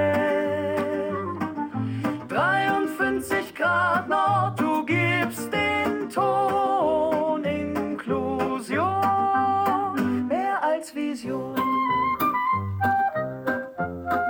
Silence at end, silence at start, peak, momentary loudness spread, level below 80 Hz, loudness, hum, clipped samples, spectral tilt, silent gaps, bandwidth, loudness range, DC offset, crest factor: 0 s; 0 s; -10 dBFS; 7 LU; -58 dBFS; -24 LUFS; none; under 0.1%; -6 dB/octave; none; 18 kHz; 2 LU; under 0.1%; 14 dB